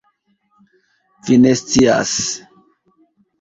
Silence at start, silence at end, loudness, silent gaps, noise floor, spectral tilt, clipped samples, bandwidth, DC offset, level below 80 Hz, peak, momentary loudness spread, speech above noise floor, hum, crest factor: 1.25 s; 1.05 s; -14 LUFS; none; -63 dBFS; -4 dB/octave; under 0.1%; 8 kHz; under 0.1%; -46 dBFS; 0 dBFS; 14 LU; 50 dB; none; 18 dB